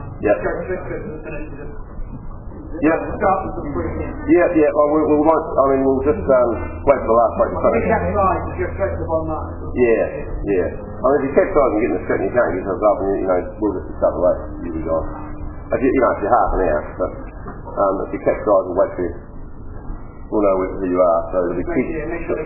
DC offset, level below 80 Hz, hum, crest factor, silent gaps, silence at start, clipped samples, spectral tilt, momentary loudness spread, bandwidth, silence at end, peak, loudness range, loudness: under 0.1%; -32 dBFS; none; 18 dB; none; 0 s; under 0.1%; -13 dB/octave; 18 LU; 2.9 kHz; 0 s; 0 dBFS; 5 LU; -18 LUFS